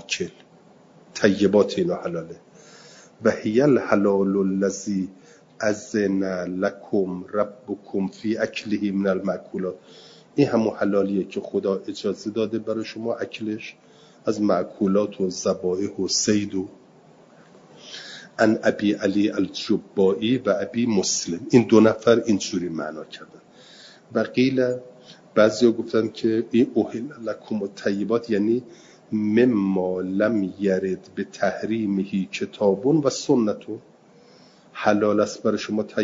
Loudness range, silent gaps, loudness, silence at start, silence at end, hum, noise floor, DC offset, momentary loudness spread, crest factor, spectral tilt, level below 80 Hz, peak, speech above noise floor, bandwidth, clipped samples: 5 LU; none; -23 LUFS; 0.1 s; 0 s; none; -52 dBFS; under 0.1%; 12 LU; 22 dB; -5 dB/octave; -66 dBFS; -2 dBFS; 30 dB; 7.8 kHz; under 0.1%